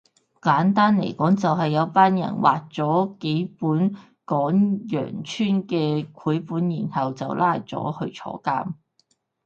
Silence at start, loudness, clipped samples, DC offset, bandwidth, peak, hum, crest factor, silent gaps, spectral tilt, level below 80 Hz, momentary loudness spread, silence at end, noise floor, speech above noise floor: 0.45 s; -23 LUFS; under 0.1%; under 0.1%; 7.4 kHz; -2 dBFS; none; 20 dB; none; -7.5 dB/octave; -66 dBFS; 10 LU; 0.7 s; -67 dBFS; 45 dB